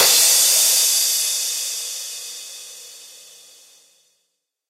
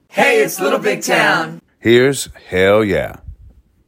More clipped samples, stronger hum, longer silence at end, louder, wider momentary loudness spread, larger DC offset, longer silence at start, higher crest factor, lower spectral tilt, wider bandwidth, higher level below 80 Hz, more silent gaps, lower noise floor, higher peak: neither; neither; first, 1.55 s vs 0.55 s; about the same, -15 LUFS vs -14 LUFS; first, 23 LU vs 9 LU; neither; second, 0 s vs 0.15 s; about the same, 20 dB vs 16 dB; second, 3.5 dB/octave vs -4 dB/octave; about the same, 16 kHz vs 16.5 kHz; second, -70 dBFS vs -44 dBFS; neither; first, -74 dBFS vs -45 dBFS; about the same, -2 dBFS vs 0 dBFS